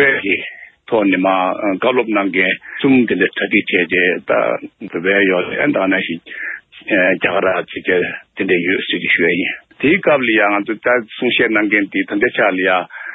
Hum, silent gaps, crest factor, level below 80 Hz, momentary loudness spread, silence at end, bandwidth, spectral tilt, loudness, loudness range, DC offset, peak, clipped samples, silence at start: none; none; 16 dB; -56 dBFS; 7 LU; 0 s; 4 kHz; -9 dB/octave; -15 LUFS; 2 LU; under 0.1%; 0 dBFS; under 0.1%; 0 s